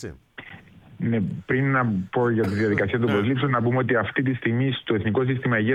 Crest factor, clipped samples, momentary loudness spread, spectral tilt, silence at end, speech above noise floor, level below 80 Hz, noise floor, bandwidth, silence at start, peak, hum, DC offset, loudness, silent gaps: 14 dB; under 0.1%; 8 LU; -8.5 dB/octave; 0 s; 24 dB; -56 dBFS; -46 dBFS; 7.6 kHz; 0 s; -8 dBFS; none; under 0.1%; -23 LUFS; none